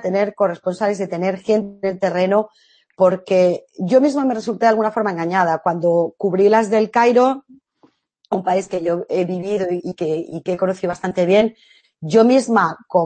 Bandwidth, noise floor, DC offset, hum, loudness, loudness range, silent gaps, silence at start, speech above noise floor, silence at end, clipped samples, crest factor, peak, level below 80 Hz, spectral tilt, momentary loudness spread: 8.8 kHz; -58 dBFS; under 0.1%; none; -18 LUFS; 5 LU; none; 0 s; 40 dB; 0 s; under 0.1%; 16 dB; -2 dBFS; -64 dBFS; -6.5 dB/octave; 9 LU